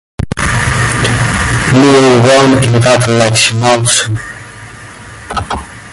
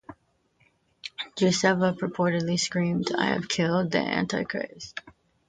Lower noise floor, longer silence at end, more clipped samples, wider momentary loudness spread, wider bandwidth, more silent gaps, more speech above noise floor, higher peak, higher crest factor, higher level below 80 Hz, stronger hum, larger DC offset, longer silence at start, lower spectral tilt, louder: second, -30 dBFS vs -67 dBFS; second, 0 s vs 0.4 s; neither; first, 22 LU vs 16 LU; first, 11.5 kHz vs 9.4 kHz; neither; second, 22 dB vs 42 dB; first, 0 dBFS vs -6 dBFS; second, 10 dB vs 20 dB; first, -28 dBFS vs -62 dBFS; neither; neither; about the same, 0.2 s vs 0.1 s; about the same, -4.5 dB/octave vs -4.5 dB/octave; first, -9 LUFS vs -26 LUFS